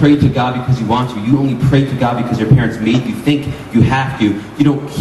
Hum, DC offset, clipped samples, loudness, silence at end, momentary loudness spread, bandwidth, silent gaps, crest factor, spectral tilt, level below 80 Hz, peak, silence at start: none; under 0.1%; under 0.1%; -14 LUFS; 0 s; 5 LU; 12.5 kHz; none; 12 dB; -7.5 dB/octave; -36 dBFS; 0 dBFS; 0 s